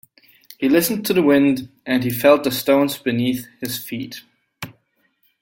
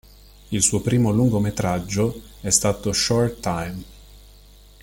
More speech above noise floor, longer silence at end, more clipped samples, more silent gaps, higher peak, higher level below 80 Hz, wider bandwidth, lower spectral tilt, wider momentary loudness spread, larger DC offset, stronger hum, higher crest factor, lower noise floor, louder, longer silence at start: first, 46 dB vs 27 dB; about the same, 0.7 s vs 0.65 s; neither; neither; about the same, -2 dBFS vs -2 dBFS; second, -60 dBFS vs -44 dBFS; about the same, 17 kHz vs 17 kHz; about the same, -5 dB/octave vs -4.5 dB/octave; first, 20 LU vs 10 LU; neither; second, none vs 50 Hz at -40 dBFS; about the same, 18 dB vs 20 dB; first, -65 dBFS vs -48 dBFS; about the same, -19 LUFS vs -21 LUFS; about the same, 0.6 s vs 0.5 s